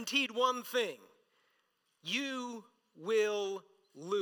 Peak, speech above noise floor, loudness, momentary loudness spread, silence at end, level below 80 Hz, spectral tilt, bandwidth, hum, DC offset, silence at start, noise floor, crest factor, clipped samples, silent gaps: -16 dBFS; 43 dB; -34 LUFS; 16 LU; 0 s; under -90 dBFS; -2.5 dB/octave; 19 kHz; none; under 0.1%; 0 s; -78 dBFS; 20 dB; under 0.1%; none